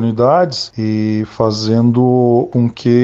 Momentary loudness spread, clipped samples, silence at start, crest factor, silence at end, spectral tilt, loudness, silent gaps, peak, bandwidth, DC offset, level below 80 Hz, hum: 6 LU; under 0.1%; 0 s; 12 dB; 0 s; -7.5 dB/octave; -14 LUFS; none; 0 dBFS; 7.8 kHz; under 0.1%; -50 dBFS; none